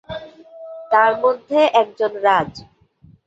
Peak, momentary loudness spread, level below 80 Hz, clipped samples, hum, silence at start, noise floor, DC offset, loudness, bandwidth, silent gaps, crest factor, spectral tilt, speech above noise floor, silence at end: -2 dBFS; 18 LU; -56 dBFS; under 0.1%; none; 0.1 s; -51 dBFS; under 0.1%; -17 LUFS; 8 kHz; none; 18 dB; -5 dB/octave; 34 dB; 0.65 s